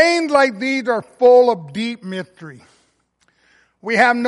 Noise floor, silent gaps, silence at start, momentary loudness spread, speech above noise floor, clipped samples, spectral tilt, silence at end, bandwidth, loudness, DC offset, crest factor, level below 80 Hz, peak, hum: -63 dBFS; none; 0 s; 17 LU; 46 dB; under 0.1%; -4.5 dB/octave; 0 s; 11.5 kHz; -16 LUFS; under 0.1%; 14 dB; -66 dBFS; -2 dBFS; none